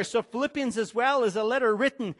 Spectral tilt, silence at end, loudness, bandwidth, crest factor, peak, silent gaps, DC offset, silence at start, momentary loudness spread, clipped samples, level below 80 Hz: -4.5 dB/octave; 0.05 s; -26 LUFS; 11.5 kHz; 14 dB; -12 dBFS; none; under 0.1%; 0 s; 5 LU; under 0.1%; -68 dBFS